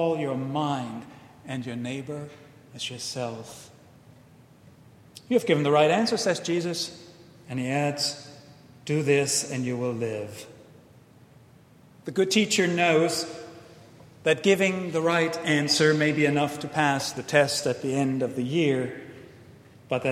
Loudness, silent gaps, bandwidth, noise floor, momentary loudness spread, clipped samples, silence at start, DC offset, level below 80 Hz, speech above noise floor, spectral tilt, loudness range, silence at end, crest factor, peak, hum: -25 LUFS; none; 16 kHz; -54 dBFS; 19 LU; under 0.1%; 0 s; under 0.1%; -68 dBFS; 29 dB; -4.5 dB/octave; 10 LU; 0 s; 22 dB; -4 dBFS; none